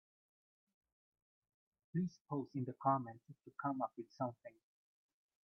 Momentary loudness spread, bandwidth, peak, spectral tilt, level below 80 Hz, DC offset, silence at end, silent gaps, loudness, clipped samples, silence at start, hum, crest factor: 18 LU; 6.6 kHz; -22 dBFS; -9 dB/octave; -88 dBFS; under 0.1%; 0.95 s; 2.21-2.25 s; -42 LUFS; under 0.1%; 1.95 s; none; 24 dB